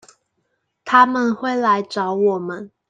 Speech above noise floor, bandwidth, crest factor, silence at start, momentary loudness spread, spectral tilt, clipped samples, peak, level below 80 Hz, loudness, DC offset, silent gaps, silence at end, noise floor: 54 dB; 9.4 kHz; 18 dB; 0.85 s; 12 LU; -5.5 dB/octave; under 0.1%; -2 dBFS; -70 dBFS; -18 LUFS; under 0.1%; none; 0.25 s; -71 dBFS